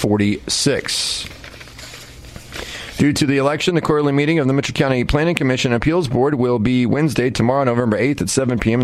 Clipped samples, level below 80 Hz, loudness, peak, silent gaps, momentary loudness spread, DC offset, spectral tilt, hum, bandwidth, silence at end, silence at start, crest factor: under 0.1%; -38 dBFS; -17 LUFS; -2 dBFS; none; 17 LU; under 0.1%; -5 dB/octave; none; 15 kHz; 0 s; 0 s; 16 dB